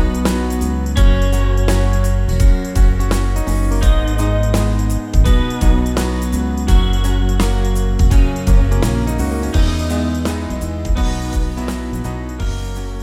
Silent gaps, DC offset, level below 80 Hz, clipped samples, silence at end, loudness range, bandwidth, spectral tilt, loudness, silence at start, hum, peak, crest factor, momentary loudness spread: none; under 0.1%; -16 dBFS; under 0.1%; 0 s; 3 LU; 14.5 kHz; -6 dB/octave; -17 LUFS; 0 s; none; -2 dBFS; 12 dB; 8 LU